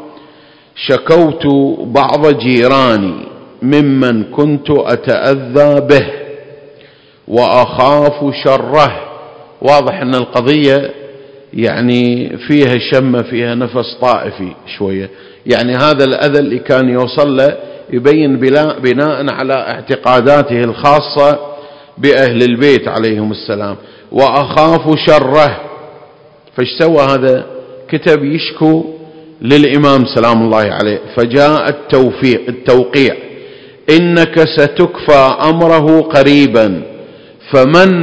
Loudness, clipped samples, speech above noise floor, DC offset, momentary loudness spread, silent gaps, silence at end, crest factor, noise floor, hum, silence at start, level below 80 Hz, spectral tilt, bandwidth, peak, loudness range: -10 LUFS; 2%; 32 dB; 0.3%; 12 LU; none; 0 s; 10 dB; -42 dBFS; none; 0 s; -44 dBFS; -7 dB/octave; 8 kHz; 0 dBFS; 3 LU